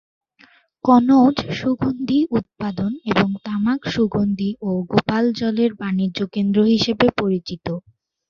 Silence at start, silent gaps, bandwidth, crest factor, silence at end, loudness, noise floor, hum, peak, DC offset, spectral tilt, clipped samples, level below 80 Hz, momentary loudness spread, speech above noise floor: 0.85 s; none; 7 kHz; 18 dB; 0.5 s; -19 LUFS; -54 dBFS; none; -2 dBFS; under 0.1%; -7 dB/octave; under 0.1%; -50 dBFS; 9 LU; 35 dB